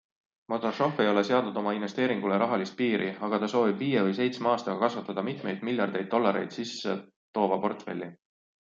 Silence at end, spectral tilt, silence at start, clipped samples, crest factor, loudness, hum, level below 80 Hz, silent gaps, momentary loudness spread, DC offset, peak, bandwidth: 0.55 s; -6 dB/octave; 0.5 s; under 0.1%; 18 dB; -29 LUFS; none; -76 dBFS; 7.16-7.34 s; 8 LU; under 0.1%; -10 dBFS; 7.6 kHz